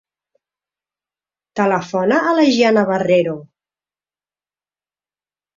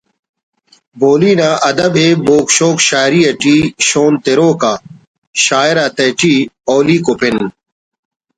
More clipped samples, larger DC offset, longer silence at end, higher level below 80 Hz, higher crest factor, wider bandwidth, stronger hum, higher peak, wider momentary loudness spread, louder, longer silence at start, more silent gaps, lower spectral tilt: neither; neither; first, 2.1 s vs 0.9 s; second, -64 dBFS vs -50 dBFS; first, 18 dB vs 12 dB; second, 7.6 kHz vs 10.5 kHz; first, 50 Hz at -50 dBFS vs none; about the same, -2 dBFS vs 0 dBFS; first, 10 LU vs 5 LU; second, -16 LUFS vs -11 LUFS; first, 1.55 s vs 0.95 s; second, none vs 5.07-5.33 s; first, -5.5 dB/octave vs -4 dB/octave